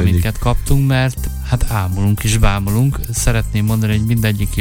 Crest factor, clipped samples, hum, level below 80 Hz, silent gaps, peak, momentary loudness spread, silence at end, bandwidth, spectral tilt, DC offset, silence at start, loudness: 14 dB; under 0.1%; none; -22 dBFS; none; 0 dBFS; 4 LU; 0 s; 17.5 kHz; -5.5 dB/octave; under 0.1%; 0 s; -17 LUFS